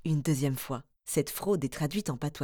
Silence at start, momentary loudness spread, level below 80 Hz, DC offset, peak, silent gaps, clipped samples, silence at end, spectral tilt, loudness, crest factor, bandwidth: 0.05 s; 7 LU; -58 dBFS; under 0.1%; -14 dBFS; none; under 0.1%; 0 s; -6 dB/octave; -32 LUFS; 16 dB; over 20 kHz